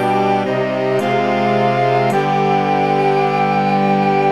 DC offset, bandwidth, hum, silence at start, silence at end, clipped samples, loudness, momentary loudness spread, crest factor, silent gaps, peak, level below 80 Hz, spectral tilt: 0.4%; 12.5 kHz; none; 0 s; 0 s; under 0.1%; -15 LUFS; 2 LU; 12 dB; none; -4 dBFS; -66 dBFS; -7 dB/octave